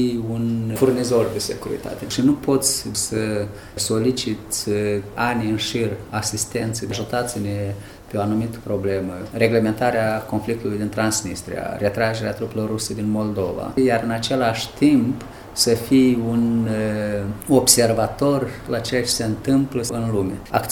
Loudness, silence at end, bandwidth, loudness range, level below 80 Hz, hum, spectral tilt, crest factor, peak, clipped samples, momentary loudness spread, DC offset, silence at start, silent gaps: -21 LUFS; 0 s; 18.5 kHz; 5 LU; -46 dBFS; none; -4.5 dB/octave; 20 dB; 0 dBFS; under 0.1%; 9 LU; under 0.1%; 0 s; none